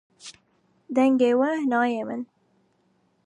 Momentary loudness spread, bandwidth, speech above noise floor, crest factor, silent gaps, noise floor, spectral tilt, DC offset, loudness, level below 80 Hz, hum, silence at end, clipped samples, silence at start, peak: 24 LU; 10.5 kHz; 45 dB; 16 dB; none; -67 dBFS; -5 dB/octave; under 0.1%; -23 LUFS; -80 dBFS; none; 1 s; under 0.1%; 0.25 s; -10 dBFS